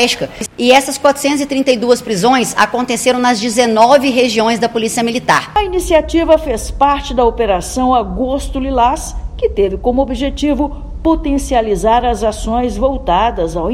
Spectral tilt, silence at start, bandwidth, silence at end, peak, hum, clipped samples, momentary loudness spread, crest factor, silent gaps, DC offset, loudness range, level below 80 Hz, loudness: -4 dB/octave; 0 s; 16.5 kHz; 0 s; 0 dBFS; none; 0.3%; 8 LU; 14 dB; none; under 0.1%; 4 LU; -26 dBFS; -13 LUFS